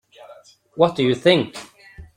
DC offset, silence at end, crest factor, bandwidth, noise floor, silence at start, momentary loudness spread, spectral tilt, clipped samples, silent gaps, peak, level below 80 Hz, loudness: under 0.1%; 0.1 s; 20 dB; 12 kHz; -47 dBFS; 0.3 s; 20 LU; -6 dB/octave; under 0.1%; none; -2 dBFS; -54 dBFS; -19 LUFS